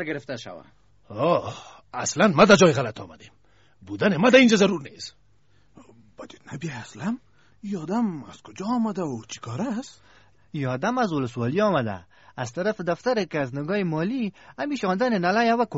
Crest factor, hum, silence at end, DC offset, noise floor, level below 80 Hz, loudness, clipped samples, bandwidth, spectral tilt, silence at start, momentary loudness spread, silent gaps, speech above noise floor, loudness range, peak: 22 dB; none; 0 s; 0.1%; -63 dBFS; -60 dBFS; -23 LUFS; under 0.1%; 8 kHz; -4.5 dB/octave; 0 s; 23 LU; none; 39 dB; 11 LU; -4 dBFS